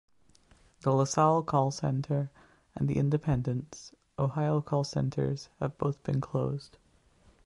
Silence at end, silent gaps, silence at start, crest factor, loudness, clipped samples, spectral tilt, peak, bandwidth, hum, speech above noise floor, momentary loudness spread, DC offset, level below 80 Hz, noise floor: 0.8 s; none; 0.85 s; 18 dB; -30 LUFS; under 0.1%; -7 dB/octave; -12 dBFS; 11 kHz; none; 34 dB; 12 LU; under 0.1%; -56 dBFS; -63 dBFS